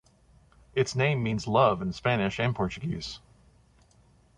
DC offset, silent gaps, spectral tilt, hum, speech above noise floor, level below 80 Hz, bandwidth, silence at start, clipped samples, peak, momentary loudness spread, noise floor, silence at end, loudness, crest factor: under 0.1%; none; -6 dB/octave; none; 34 dB; -54 dBFS; 10.5 kHz; 0.75 s; under 0.1%; -8 dBFS; 11 LU; -61 dBFS; 1.2 s; -27 LUFS; 20 dB